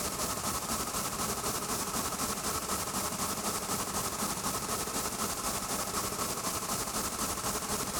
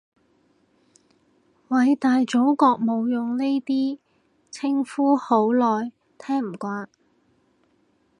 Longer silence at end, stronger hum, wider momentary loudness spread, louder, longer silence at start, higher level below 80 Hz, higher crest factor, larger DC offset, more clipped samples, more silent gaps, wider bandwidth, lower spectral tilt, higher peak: second, 0 s vs 1.35 s; neither; second, 1 LU vs 14 LU; second, -32 LUFS vs -22 LUFS; second, 0 s vs 1.7 s; first, -52 dBFS vs -78 dBFS; about the same, 16 dB vs 20 dB; neither; neither; neither; first, over 20 kHz vs 10.5 kHz; second, -2 dB/octave vs -6 dB/octave; second, -18 dBFS vs -4 dBFS